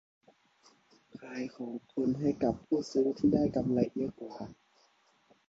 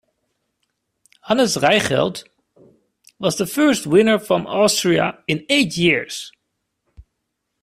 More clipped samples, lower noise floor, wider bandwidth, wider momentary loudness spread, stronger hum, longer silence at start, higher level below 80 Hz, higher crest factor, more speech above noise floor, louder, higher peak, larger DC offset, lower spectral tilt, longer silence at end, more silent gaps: neither; second, -69 dBFS vs -76 dBFS; second, 7.8 kHz vs 16 kHz; first, 16 LU vs 9 LU; neither; about the same, 1.15 s vs 1.25 s; about the same, -60 dBFS vs -56 dBFS; about the same, 20 dB vs 18 dB; second, 37 dB vs 58 dB; second, -32 LUFS vs -17 LUFS; second, -14 dBFS vs -2 dBFS; neither; first, -8 dB/octave vs -4 dB/octave; first, 0.95 s vs 0.6 s; neither